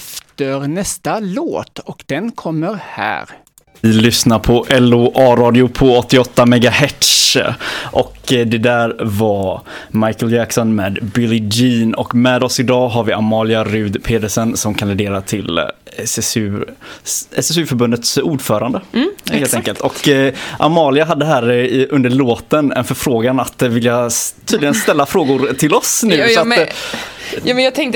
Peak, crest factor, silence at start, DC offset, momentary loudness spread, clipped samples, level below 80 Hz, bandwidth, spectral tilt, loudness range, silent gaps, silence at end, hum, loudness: 0 dBFS; 14 dB; 0 s; under 0.1%; 10 LU; under 0.1%; -40 dBFS; 19 kHz; -4.5 dB/octave; 7 LU; none; 0 s; none; -14 LUFS